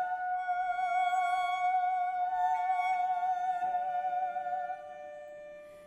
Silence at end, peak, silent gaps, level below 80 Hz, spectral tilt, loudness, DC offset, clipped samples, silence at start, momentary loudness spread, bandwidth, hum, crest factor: 0 s; -20 dBFS; none; -74 dBFS; -1.5 dB/octave; -32 LUFS; under 0.1%; under 0.1%; 0 s; 16 LU; 9.4 kHz; none; 12 dB